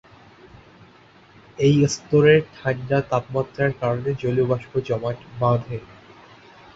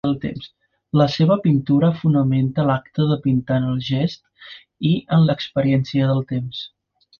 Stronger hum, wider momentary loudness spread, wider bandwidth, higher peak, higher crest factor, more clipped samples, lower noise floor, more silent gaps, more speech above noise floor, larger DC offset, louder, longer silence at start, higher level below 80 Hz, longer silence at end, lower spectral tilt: neither; second, 10 LU vs 15 LU; first, 8 kHz vs 6.8 kHz; about the same, -4 dBFS vs -4 dBFS; about the same, 20 dB vs 16 dB; neither; first, -51 dBFS vs -43 dBFS; neither; first, 30 dB vs 25 dB; neither; about the same, -21 LUFS vs -19 LUFS; first, 1.6 s vs 0.05 s; about the same, -52 dBFS vs -52 dBFS; first, 0.9 s vs 0.55 s; second, -6.5 dB/octave vs -8.5 dB/octave